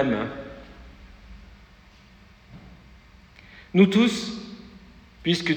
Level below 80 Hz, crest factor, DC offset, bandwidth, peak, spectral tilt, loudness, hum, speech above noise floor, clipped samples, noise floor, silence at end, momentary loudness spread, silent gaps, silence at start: -52 dBFS; 22 dB; under 0.1%; 9.8 kHz; -4 dBFS; -6 dB/octave; -23 LUFS; none; 31 dB; under 0.1%; -52 dBFS; 0 s; 29 LU; none; 0 s